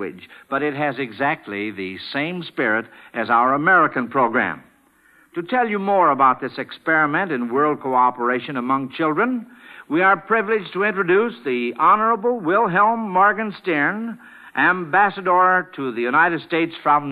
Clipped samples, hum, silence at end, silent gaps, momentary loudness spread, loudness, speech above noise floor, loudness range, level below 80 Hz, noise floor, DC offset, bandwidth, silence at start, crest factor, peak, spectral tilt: under 0.1%; none; 0 s; none; 11 LU; -19 LUFS; 36 dB; 2 LU; -70 dBFS; -56 dBFS; under 0.1%; 12.5 kHz; 0 s; 16 dB; -4 dBFS; -7.5 dB/octave